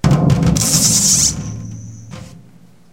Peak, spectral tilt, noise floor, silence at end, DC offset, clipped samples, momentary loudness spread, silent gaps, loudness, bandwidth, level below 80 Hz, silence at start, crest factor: 0 dBFS; -3.5 dB/octave; -46 dBFS; 0.55 s; under 0.1%; under 0.1%; 24 LU; none; -12 LUFS; 17 kHz; -32 dBFS; 0.05 s; 16 dB